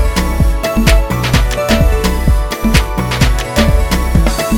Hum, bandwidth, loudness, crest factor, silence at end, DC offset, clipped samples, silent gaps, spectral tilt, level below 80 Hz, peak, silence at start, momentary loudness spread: none; 17.5 kHz; -13 LUFS; 12 dB; 0 s; under 0.1%; under 0.1%; none; -5 dB/octave; -14 dBFS; 0 dBFS; 0 s; 3 LU